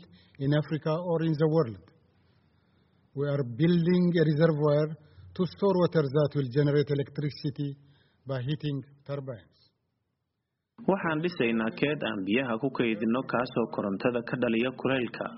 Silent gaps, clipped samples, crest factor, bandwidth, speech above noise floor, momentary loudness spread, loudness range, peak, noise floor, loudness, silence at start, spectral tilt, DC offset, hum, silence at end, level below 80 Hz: none; under 0.1%; 18 dB; 5.8 kHz; 55 dB; 13 LU; 9 LU; -10 dBFS; -83 dBFS; -28 LUFS; 0 s; -6.5 dB/octave; under 0.1%; none; 0 s; -66 dBFS